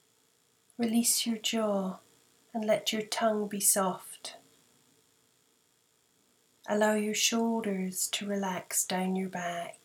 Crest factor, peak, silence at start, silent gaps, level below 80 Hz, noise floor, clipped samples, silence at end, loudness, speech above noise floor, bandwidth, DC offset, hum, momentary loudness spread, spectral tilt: 20 dB; -12 dBFS; 0.8 s; none; -82 dBFS; -70 dBFS; under 0.1%; 0.15 s; -30 LUFS; 40 dB; 19.5 kHz; under 0.1%; none; 15 LU; -3 dB/octave